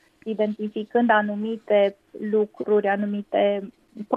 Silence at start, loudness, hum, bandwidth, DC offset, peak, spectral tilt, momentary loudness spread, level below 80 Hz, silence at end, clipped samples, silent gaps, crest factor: 0.25 s; -23 LUFS; none; 4.9 kHz; under 0.1%; -4 dBFS; -8 dB/octave; 11 LU; -72 dBFS; 0 s; under 0.1%; none; 18 dB